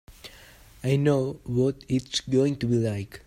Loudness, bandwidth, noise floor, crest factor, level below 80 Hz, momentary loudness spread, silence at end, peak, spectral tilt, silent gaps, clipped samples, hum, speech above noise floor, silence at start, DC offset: -26 LUFS; 15.5 kHz; -50 dBFS; 16 dB; -54 dBFS; 15 LU; 0.1 s; -10 dBFS; -6.5 dB/octave; none; under 0.1%; none; 26 dB; 0.1 s; under 0.1%